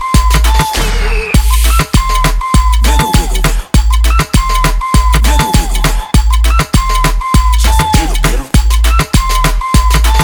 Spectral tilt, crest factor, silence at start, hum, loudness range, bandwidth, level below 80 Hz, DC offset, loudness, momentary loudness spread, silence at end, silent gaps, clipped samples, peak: -4 dB/octave; 8 dB; 0 s; none; 0 LU; over 20 kHz; -10 dBFS; under 0.1%; -11 LUFS; 3 LU; 0 s; none; 0.5%; 0 dBFS